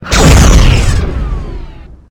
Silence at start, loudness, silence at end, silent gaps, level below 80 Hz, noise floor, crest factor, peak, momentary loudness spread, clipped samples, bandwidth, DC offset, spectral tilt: 0 s; -8 LUFS; 0.3 s; none; -10 dBFS; -28 dBFS; 8 dB; 0 dBFS; 19 LU; 2%; 18.5 kHz; under 0.1%; -4.5 dB/octave